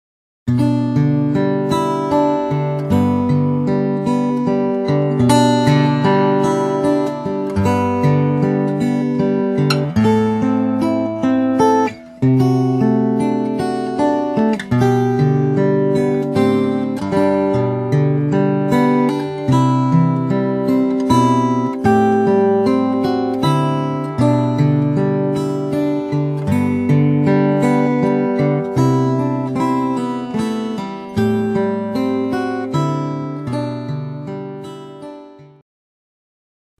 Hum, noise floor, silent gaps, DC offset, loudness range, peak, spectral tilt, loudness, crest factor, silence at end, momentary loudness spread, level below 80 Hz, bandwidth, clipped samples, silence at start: none; -38 dBFS; none; under 0.1%; 5 LU; 0 dBFS; -8 dB/octave; -16 LUFS; 16 dB; 1.35 s; 7 LU; -50 dBFS; 13.5 kHz; under 0.1%; 0.45 s